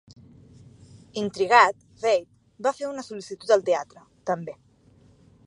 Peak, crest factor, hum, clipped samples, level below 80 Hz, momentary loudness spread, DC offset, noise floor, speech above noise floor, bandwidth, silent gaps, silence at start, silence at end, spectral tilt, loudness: -2 dBFS; 24 dB; none; under 0.1%; -66 dBFS; 19 LU; under 0.1%; -57 dBFS; 33 dB; 11 kHz; none; 1.15 s; 0.95 s; -4 dB/octave; -24 LUFS